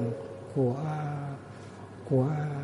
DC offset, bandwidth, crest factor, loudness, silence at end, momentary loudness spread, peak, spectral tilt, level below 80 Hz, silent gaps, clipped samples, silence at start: under 0.1%; 11 kHz; 16 dB; -31 LUFS; 0 s; 17 LU; -14 dBFS; -9 dB/octave; -64 dBFS; none; under 0.1%; 0 s